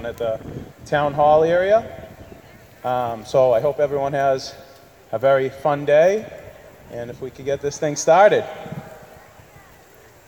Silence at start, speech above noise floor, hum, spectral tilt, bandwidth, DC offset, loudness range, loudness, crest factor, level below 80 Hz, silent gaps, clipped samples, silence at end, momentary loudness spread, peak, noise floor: 0 s; 29 dB; none; -5 dB/octave; 19.5 kHz; under 0.1%; 2 LU; -19 LUFS; 18 dB; -52 dBFS; none; under 0.1%; 1.3 s; 20 LU; -2 dBFS; -48 dBFS